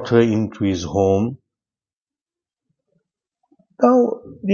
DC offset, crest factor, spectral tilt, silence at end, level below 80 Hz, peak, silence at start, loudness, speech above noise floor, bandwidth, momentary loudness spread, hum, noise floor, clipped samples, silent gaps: under 0.1%; 20 dB; -7 dB/octave; 0 s; -54 dBFS; -2 dBFS; 0 s; -19 LUFS; over 73 dB; 7.2 kHz; 8 LU; none; under -90 dBFS; under 0.1%; 1.93-2.07 s, 2.21-2.26 s